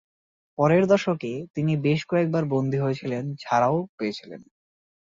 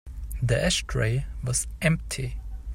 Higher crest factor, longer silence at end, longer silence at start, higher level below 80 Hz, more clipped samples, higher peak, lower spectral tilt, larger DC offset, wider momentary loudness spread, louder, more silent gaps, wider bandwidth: about the same, 18 dB vs 18 dB; first, 0.6 s vs 0 s; first, 0.6 s vs 0.05 s; second, -64 dBFS vs -36 dBFS; neither; about the same, -8 dBFS vs -8 dBFS; first, -7.5 dB/octave vs -4 dB/octave; neither; about the same, 11 LU vs 10 LU; first, -24 LUFS vs -27 LUFS; first, 1.50-1.54 s, 3.89-3.98 s vs none; second, 7.6 kHz vs 16 kHz